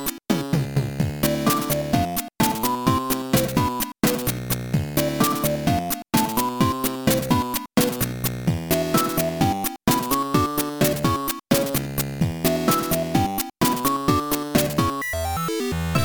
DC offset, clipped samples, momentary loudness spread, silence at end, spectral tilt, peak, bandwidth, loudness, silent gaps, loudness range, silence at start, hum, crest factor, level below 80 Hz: 0.2%; under 0.1%; 4 LU; 0 s; -5 dB/octave; -4 dBFS; over 20 kHz; -22 LUFS; none; 1 LU; 0 s; none; 18 dB; -42 dBFS